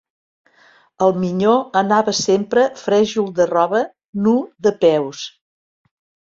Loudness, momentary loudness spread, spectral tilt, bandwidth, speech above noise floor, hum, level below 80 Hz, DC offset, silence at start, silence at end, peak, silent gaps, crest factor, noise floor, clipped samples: -17 LUFS; 6 LU; -5 dB/octave; 7.8 kHz; 36 dB; none; -60 dBFS; under 0.1%; 1 s; 1.1 s; -2 dBFS; 4.09-4.13 s; 16 dB; -53 dBFS; under 0.1%